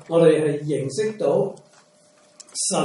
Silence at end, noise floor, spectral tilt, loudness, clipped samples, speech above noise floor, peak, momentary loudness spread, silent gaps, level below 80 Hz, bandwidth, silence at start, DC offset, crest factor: 0 s; -56 dBFS; -5 dB/octave; -21 LUFS; under 0.1%; 36 dB; -4 dBFS; 10 LU; none; -68 dBFS; 11.5 kHz; 0.1 s; under 0.1%; 18 dB